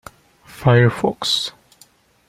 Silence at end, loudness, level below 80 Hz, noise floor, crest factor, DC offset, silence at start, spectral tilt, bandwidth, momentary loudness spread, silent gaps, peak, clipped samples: 0.8 s; -18 LUFS; -52 dBFS; -53 dBFS; 18 dB; under 0.1%; 0.55 s; -5.5 dB/octave; 14.5 kHz; 7 LU; none; -2 dBFS; under 0.1%